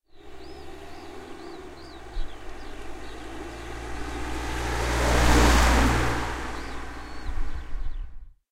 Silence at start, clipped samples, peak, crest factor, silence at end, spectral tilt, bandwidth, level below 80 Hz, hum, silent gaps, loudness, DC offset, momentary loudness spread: 0.15 s; under 0.1%; -6 dBFS; 20 dB; 0.2 s; -4.5 dB/octave; 16 kHz; -30 dBFS; none; none; -26 LUFS; under 0.1%; 23 LU